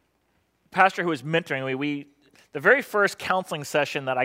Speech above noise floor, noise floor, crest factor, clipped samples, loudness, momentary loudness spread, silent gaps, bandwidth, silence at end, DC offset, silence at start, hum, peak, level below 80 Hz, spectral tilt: 45 dB; -69 dBFS; 22 dB; under 0.1%; -24 LUFS; 10 LU; none; 16 kHz; 0 s; under 0.1%; 0.75 s; none; -2 dBFS; -74 dBFS; -4.5 dB/octave